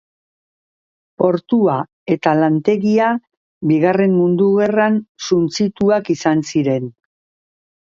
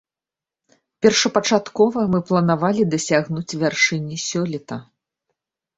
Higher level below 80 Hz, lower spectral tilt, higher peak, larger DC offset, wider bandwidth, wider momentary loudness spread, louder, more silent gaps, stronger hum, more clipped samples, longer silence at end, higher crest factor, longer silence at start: about the same, -60 dBFS vs -58 dBFS; first, -6.5 dB/octave vs -4.5 dB/octave; about the same, 0 dBFS vs -2 dBFS; neither; about the same, 7.6 kHz vs 8.2 kHz; about the same, 7 LU vs 9 LU; first, -16 LUFS vs -19 LUFS; first, 1.93-2.06 s, 3.37-3.61 s, 5.09-5.15 s vs none; neither; neither; about the same, 1.05 s vs 0.95 s; about the same, 16 dB vs 20 dB; first, 1.2 s vs 1 s